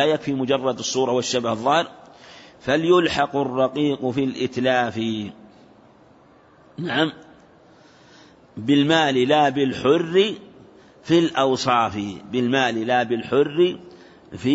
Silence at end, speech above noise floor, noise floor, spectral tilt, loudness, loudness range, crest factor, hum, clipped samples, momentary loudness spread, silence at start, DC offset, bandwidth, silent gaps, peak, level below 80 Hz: 0 s; 32 dB; -52 dBFS; -5 dB/octave; -21 LUFS; 7 LU; 16 dB; none; under 0.1%; 13 LU; 0 s; under 0.1%; 8 kHz; none; -6 dBFS; -60 dBFS